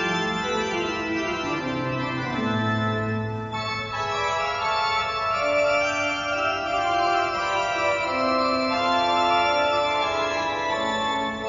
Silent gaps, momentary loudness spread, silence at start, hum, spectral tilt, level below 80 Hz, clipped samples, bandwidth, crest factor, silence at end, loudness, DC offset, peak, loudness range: none; 6 LU; 0 s; none; -4.5 dB/octave; -52 dBFS; under 0.1%; 7.4 kHz; 14 dB; 0 s; -24 LUFS; under 0.1%; -10 dBFS; 4 LU